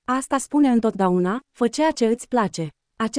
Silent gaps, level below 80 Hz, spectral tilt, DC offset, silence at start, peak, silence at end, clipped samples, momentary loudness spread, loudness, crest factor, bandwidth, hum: none; -56 dBFS; -5.5 dB/octave; under 0.1%; 0.1 s; -8 dBFS; 0 s; under 0.1%; 8 LU; -21 LUFS; 14 dB; 10.5 kHz; none